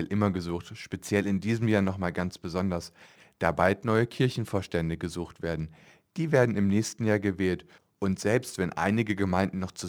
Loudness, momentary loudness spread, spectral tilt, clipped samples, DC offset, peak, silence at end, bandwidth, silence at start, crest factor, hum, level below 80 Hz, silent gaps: -28 LUFS; 11 LU; -6.5 dB/octave; under 0.1%; under 0.1%; -6 dBFS; 0 s; 16.5 kHz; 0 s; 22 dB; none; -54 dBFS; none